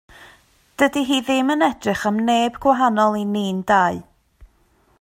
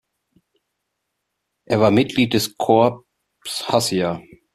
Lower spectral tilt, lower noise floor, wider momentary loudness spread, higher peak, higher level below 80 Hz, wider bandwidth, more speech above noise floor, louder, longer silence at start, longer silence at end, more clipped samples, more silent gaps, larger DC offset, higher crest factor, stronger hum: about the same, -5 dB/octave vs -5 dB/octave; second, -59 dBFS vs -77 dBFS; second, 6 LU vs 12 LU; about the same, -4 dBFS vs -2 dBFS; about the same, -54 dBFS vs -56 dBFS; about the same, 16.5 kHz vs 15.5 kHz; second, 41 dB vs 59 dB; about the same, -19 LUFS vs -19 LUFS; second, 0.2 s vs 1.7 s; first, 0.55 s vs 0.35 s; neither; neither; neither; about the same, 16 dB vs 18 dB; neither